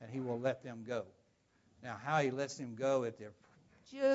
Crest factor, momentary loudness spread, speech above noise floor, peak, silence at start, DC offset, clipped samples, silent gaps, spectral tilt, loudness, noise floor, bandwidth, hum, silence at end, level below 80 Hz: 18 dB; 19 LU; 36 dB; -20 dBFS; 0 s; under 0.1%; under 0.1%; none; -5 dB/octave; -38 LUFS; -73 dBFS; 7.6 kHz; none; 0 s; -80 dBFS